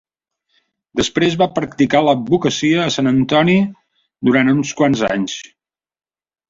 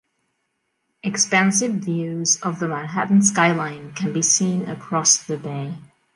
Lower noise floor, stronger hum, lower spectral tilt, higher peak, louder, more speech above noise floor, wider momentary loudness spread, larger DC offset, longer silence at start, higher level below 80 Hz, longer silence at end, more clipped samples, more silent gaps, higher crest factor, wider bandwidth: about the same, -70 dBFS vs -73 dBFS; neither; first, -5.5 dB/octave vs -3 dB/octave; about the same, -2 dBFS vs -4 dBFS; first, -16 LUFS vs -19 LUFS; about the same, 55 dB vs 53 dB; second, 8 LU vs 13 LU; neither; about the same, 0.95 s vs 1.05 s; first, -52 dBFS vs -68 dBFS; first, 1.05 s vs 0.35 s; neither; neither; about the same, 16 dB vs 18 dB; second, 7.8 kHz vs 11.5 kHz